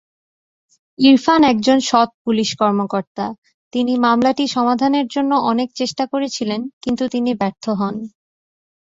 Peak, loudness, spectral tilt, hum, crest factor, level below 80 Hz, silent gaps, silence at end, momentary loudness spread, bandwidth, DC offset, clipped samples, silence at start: -2 dBFS; -17 LUFS; -4.5 dB/octave; none; 16 dB; -58 dBFS; 2.14-2.25 s, 3.07-3.15 s, 3.38-3.42 s, 3.54-3.71 s, 6.73-6.81 s; 0.75 s; 11 LU; 7.8 kHz; under 0.1%; under 0.1%; 1 s